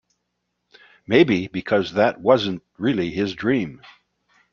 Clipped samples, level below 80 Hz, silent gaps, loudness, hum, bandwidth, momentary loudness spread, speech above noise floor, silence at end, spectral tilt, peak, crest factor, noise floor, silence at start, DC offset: under 0.1%; -58 dBFS; none; -21 LUFS; 60 Hz at -50 dBFS; 7.2 kHz; 8 LU; 56 dB; 0.75 s; -7 dB/octave; -2 dBFS; 20 dB; -76 dBFS; 1.1 s; under 0.1%